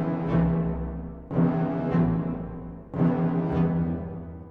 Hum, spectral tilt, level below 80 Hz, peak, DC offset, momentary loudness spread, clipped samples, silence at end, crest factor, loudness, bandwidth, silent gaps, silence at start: none; -11.5 dB/octave; -40 dBFS; -12 dBFS; under 0.1%; 13 LU; under 0.1%; 0 s; 14 dB; -26 LUFS; 3.8 kHz; none; 0 s